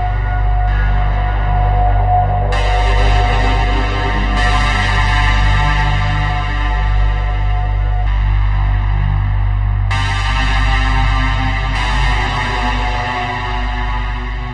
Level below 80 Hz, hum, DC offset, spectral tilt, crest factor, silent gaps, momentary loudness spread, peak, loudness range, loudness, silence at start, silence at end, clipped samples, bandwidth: -16 dBFS; none; under 0.1%; -5.5 dB/octave; 12 dB; none; 4 LU; -2 dBFS; 3 LU; -16 LUFS; 0 s; 0 s; under 0.1%; 8.8 kHz